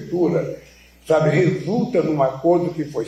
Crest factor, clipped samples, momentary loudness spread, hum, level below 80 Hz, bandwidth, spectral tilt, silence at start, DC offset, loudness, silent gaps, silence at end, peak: 14 dB; under 0.1%; 7 LU; none; -54 dBFS; 13 kHz; -8 dB/octave; 0 s; under 0.1%; -19 LUFS; none; 0 s; -6 dBFS